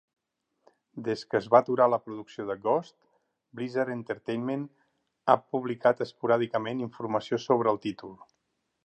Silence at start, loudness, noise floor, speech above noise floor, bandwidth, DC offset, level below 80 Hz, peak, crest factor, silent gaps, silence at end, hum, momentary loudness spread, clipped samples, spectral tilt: 0.95 s; -28 LUFS; -78 dBFS; 51 dB; 8.8 kHz; under 0.1%; -74 dBFS; -4 dBFS; 24 dB; none; 0.7 s; none; 14 LU; under 0.1%; -7 dB/octave